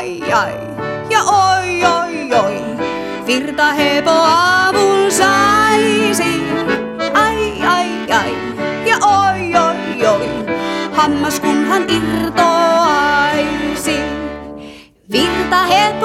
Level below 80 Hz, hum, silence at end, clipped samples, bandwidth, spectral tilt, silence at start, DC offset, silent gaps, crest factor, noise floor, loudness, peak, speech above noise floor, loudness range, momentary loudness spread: -42 dBFS; none; 0 s; under 0.1%; 16.5 kHz; -3.5 dB/octave; 0 s; under 0.1%; none; 14 dB; -36 dBFS; -14 LUFS; 0 dBFS; 23 dB; 3 LU; 10 LU